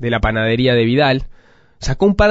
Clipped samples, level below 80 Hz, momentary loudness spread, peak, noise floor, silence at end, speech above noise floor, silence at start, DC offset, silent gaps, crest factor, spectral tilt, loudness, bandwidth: under 0.1%; -28 dBFS; 9 LU; -2 dBFS; -47 dBFS; 0 s; 33 dB; 0 s; under 0.1%; none; 14 dB; -6.5 dB/octave; -15 LUFS; 8 kHz